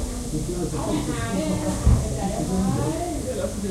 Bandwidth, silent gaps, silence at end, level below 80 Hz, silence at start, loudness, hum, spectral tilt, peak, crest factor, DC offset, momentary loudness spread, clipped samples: 16 kHz; none; 0 s; -30 dBFS; 0 s; -25 LUFS; none; -6 dB/octave; -6 dBFS; 18 dB; under 0.1%; 6 LU; under 0.1%